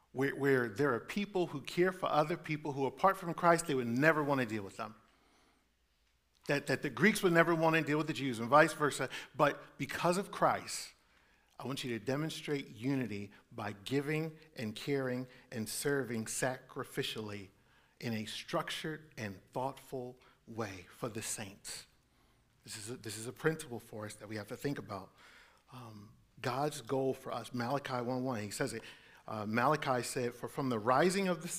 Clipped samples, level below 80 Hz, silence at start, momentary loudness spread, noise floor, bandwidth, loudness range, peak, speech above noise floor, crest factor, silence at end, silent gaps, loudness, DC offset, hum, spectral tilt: under 0.1%; -70 dBFS; 0.15 s; 16 LU; -75 dBFS; 16 kHz; 11 LU; -10 dBFS; 40 dB; 26 dB; 0 s; none; -35 LUFS; under 0.1%; none; -5 dB/octave